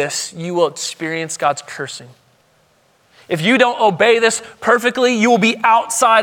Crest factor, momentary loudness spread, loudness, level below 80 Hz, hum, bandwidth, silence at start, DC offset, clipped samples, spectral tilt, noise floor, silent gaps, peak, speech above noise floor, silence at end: 16 dB; 12 LU; -15 LUFS; -66 dBFS; none; 18 kHz; 0 s; under 0.1%; under 0.1%; -3 dB/octave; -56 dBFS; none; 0 dBFS; 41 dB; 0 s